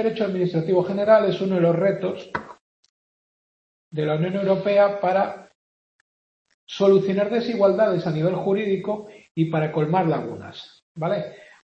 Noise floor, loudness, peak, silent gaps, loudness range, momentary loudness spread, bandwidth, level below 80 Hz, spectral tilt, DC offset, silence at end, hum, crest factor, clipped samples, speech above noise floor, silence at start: under -90 dBFS; -22 LUFS; -4 dBFS; 2.61-2.83 s, 2.89-3.91 s, 5.55-6.45 s, 6.54-6.67 s, 9.31-9.35 s, 10.82-10.95 s; 3 LU; 16 LU; 7.6 kHz; -66 dBFS; -8 dB/octave; under 0.1%; 0.25 s; none; 18 dB; under 0.1%; over 69 dB; 0 s